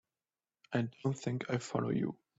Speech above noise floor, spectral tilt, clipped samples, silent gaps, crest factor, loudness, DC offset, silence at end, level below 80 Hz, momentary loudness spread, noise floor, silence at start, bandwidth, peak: over 55 dB; -6.5 dB/octave; under 0.1%; none; 18 dB; -37 LUFS; under 0.1%; 0.25 s; -72 dBFS; 3 LU; under -90 dBFS; 0.7 s; 8 kHz; -20 dBFS